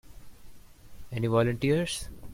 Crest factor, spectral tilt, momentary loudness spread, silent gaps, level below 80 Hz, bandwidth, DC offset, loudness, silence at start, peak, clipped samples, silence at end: 18 dB; -6 dB/octave; 10 LU; none; -50 dBFS; 16 kHz; under 0.1%; -28 LUFS; 0.05 s; -12 dBFS; under 0.1%; 0 s